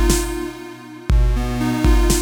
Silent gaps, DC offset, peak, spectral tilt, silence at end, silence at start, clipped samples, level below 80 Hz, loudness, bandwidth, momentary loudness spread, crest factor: none; under 0.1%; -2 dBFS; -5 dB/octave; 0 s; 0 s; under 0.1%; -18 dBFS; -20 LUFS; 18.5 kHz; 15 LU; 16 dB